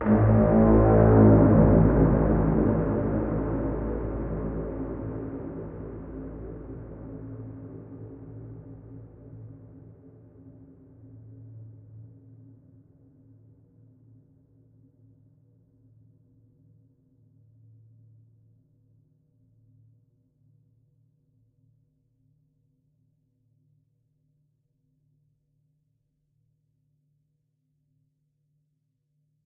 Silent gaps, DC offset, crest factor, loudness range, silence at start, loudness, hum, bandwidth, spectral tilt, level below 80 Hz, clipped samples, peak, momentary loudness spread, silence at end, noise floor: none; under 0.1%; 22 dB; 30 LU; 0 s; -22 LUFS; none; 2.8 kHz; -12 dB/octave; -38 dBFS; under 0.1%; -6 dBFS; 28 LU; 17.4 s; -75 dBFS